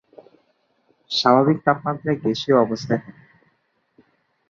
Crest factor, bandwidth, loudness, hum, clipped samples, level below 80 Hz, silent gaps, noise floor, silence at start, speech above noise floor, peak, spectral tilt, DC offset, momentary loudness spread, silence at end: 20 dB; 7.4 kHz; -20 LUFS; none; under 0.1%; -62 dBFS; none; -68 dBFS; 1.1 s; 48 dB; -2 dBFS; -6 dB/octave; under 0.1%; 9 LU; 1.4 s